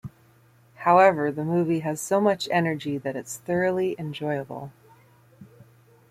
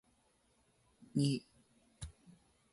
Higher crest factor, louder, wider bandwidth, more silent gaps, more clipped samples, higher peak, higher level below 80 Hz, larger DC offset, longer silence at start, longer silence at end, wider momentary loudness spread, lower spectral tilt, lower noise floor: about the same, 20 dB vs 22 dB; first, -24 LUFS vs -37 LUFS; first, 15.5 kHz vs 11.5 kHz; neither; neither; first, -6 dBFS vs -22 dBFS; about the same, -66 dBFS vs -64 dBFS; neither; second, 0.05 s vs 1 s; second, 0.45 s vs 0.6 s; about the same, 16 LU vs 18 LU; about the same, -5.5 dB/octave vs -6 dB/octave; second, -57 dBFS vs -74 dBFS